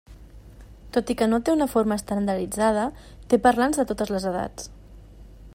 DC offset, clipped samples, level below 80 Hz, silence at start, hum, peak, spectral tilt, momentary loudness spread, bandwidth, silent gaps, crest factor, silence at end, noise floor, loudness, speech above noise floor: under 0.1%; under 0.1%; -46 dBFS; 0.1 s; none; -6 dBFS; -5 dB/octave; 11 LU; 16 kHz; none; 18 dB; 0 s; -45 dBFS; -24 LUFS; 22 dB